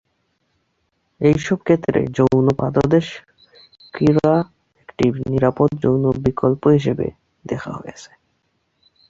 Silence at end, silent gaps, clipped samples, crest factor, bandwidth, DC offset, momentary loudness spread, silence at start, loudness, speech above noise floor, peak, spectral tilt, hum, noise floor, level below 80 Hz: 1.05 s; none; under 0.1%; 16 dB; 7.8 kHz; under 0.1%; 15 LU; 1.2 s; -18 LUFS; 51 dB; -2 dBFS; -8 dB/octave; none; -68 dBFS; -46 dBFS